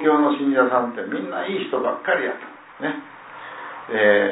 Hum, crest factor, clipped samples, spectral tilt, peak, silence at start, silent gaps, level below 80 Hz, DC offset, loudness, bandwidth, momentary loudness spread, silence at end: none; 18 dB; under 0.1%; -9 dB/octave; -2 dBFS; 0 s; none; -74 dBFS; under 0.1%; -21 LUFS; 4 kHz; 17 LU; 0 s